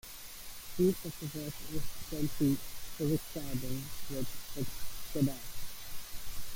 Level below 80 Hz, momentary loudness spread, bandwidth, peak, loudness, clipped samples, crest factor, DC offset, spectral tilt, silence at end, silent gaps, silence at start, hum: -50 dBFS; 13 LU; 17 kHz; -18 dBFS; -37 LUFS; under 0.1%; 16 dB; under 0.1%; -5.5 dB/octave; 0 s; none; 0.05 s; none